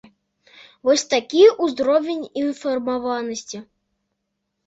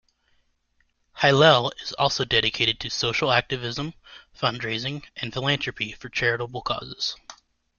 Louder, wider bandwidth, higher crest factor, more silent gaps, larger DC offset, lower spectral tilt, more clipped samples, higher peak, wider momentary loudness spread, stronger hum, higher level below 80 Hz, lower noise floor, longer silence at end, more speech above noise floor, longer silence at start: first, -20 LUFS vs -23 LUFS; about the same, 8 kHz vs 7.4 kHz; about the same, 18 dB vs 22 dB; neither; neither; second, -2.5 dB/octave vs -4 dB/octave; neither; about the same, -2 dBFS vs -4 dBFS; about the same, 15 LU vs 14 LU; neither; second, -64 dBFS vs -54 dBFS; first, -77 dBFS vs -69 dBFS; first, 1.05 s vs 0.45 s; first, 57 dB vs 44 dB; second, 0.85 s vs 1.15 s